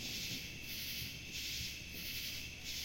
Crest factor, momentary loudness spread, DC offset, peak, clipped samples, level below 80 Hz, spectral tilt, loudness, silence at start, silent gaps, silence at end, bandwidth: 14 dB; 3 LU; under 0.1%; -30 dBFS; under 0.1%; -58 dBFS; -1.5 dB/octave; -42 LUFS; 0 s; none; 0 s; 16.5 kHz